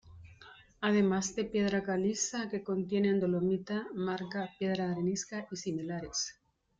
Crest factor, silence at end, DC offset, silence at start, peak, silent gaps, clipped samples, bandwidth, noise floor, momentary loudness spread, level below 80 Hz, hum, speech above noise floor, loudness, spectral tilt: 16 dB; 0.5 s; under 0.1%; 0.05 s; -18 dBFS; none; under 0.1%; 9.2 kHz; -57 dBFS; 9 LU; -66 dBFS; none; 24 dB; -33 LUFS; -5 dB/octave